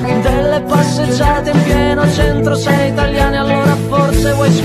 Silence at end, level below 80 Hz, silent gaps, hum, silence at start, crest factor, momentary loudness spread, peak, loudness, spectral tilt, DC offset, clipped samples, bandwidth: 0 s; -22 dBFS; none; none; 0 s; 12 dB; 2 LU; 0 dBFS; -13 LUFS; -6 dB/octave; under 0.1%; under 0.1%; 14 kHz